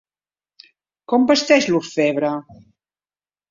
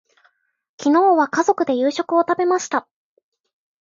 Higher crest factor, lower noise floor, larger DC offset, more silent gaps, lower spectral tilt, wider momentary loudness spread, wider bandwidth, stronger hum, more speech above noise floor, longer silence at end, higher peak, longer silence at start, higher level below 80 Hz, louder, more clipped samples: about the same, 20 dB vs 16 dB; first, under -90 dBFS vs -62 dBFS; neither; neither; about the same, -4 dB/octave vs -3.5 dB/octave; about the same, 9 LU vs 9 LU; about the same, 7.6 kHz vs 7.6 kHz; first, 50 Hz at -55 dBFS vs none; first, over 73 dB vs 45 dB; about the same, 1.1 s vs 1 s; about the same, -2 dBFS vs -4 dBFS; first, 1.1 s vs 0.8 s; first, -62 dBFS vs -74 dBFS; about the same, -17 LUFS vs -18 LUFS; neither